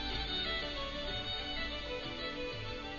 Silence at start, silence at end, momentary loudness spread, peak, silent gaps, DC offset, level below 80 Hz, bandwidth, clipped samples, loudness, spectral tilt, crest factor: 0 s; 0 s; 5 LU; -24 dBFS; none; under 0.1%; -46 dBFS; 7.2 kHz; under 0.1%; -38 LUFS; -1.5 dB/octave; 14 dB